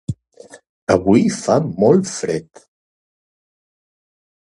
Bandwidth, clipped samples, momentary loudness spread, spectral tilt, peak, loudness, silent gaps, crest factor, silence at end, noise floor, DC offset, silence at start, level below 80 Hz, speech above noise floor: 11.5 kHz; under 0.1%; 15 LU; -6 dB/octave; 0 dBFS; -16 LUFS; 0.69-0.87 s; 20 dB; 2.05 s; -44 dBFS; under 0.1%; 0.1 s; -48 dBFS; 28 dB